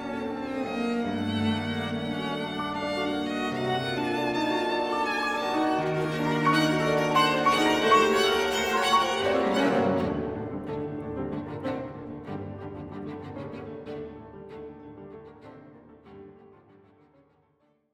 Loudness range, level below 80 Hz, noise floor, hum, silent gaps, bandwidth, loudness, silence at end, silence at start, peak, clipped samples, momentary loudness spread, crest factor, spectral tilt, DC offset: 18 LU; -56 dBFS; -68 dBFS; none; none; 19 kHz; -26 LUFS; 1.45 s; 0 s; -10 dBFS; under 0.1%; 17 LU; 18 dB; -5 dB/octave; under 0.1%